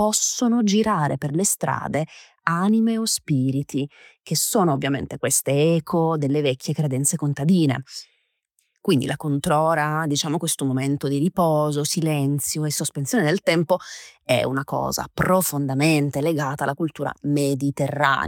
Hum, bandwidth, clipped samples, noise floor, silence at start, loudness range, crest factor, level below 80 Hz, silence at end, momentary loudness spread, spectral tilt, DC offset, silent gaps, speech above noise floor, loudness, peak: none; 19 kHz; under 0.1%; -70 dBFS; 0 s; 2 LU; 20 dB; -56 dBFS; 0 s; 7 LU; -4.5 dB/octave; under 0.1%; none; 49 dB; -22 LUFS; -2 dBFS